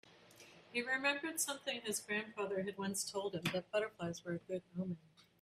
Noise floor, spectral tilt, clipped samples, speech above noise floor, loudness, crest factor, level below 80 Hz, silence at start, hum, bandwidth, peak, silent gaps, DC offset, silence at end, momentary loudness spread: -62 dBFS; -3 dB/octave; under 0.1%; 21 dB; -40 LUFS; 22 dB; -78 dBFS; 0.05 s; none; 15.5 kHz; -20 dBFS; none; under 0.1%; 0.2 s; 9 LU